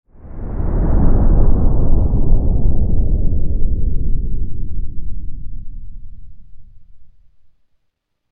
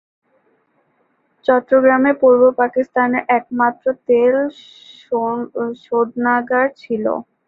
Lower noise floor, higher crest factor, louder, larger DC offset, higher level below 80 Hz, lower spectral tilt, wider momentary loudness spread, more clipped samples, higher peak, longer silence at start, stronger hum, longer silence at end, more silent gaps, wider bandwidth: first, -68 dBFS vs -63 dBFS; about the same, 12 dB vs 16 dB; second, -20 LUFS vs -16 LUFS; neither; first, -16 dBFS vs -64 dBFS; first, -15 dB/octave vs -7.5 dB/octave; first, 19 LU vs 10 LU; neither; about the same, 0 dBFS vs -2 dBFS; second, 0.25 s vs 1.5 s; neither; first, 1.25 s vs 0.25 s; neither; second, 1.7 kHz vs 4.7 kHz